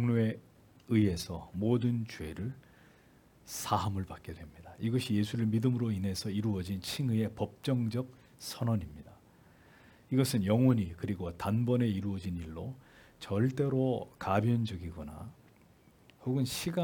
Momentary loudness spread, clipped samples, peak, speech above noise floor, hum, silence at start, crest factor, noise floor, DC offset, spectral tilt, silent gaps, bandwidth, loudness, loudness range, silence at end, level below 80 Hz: 16 LU; under 0.1%; -14 dBFS; 30 dB; none; 0 s; 18 dB; -62 dBFS; under 0.1%; -6.5 dB/octave; none; 18 kHz; -33 LUFS; 4 LU; 0 s; -62 dBFS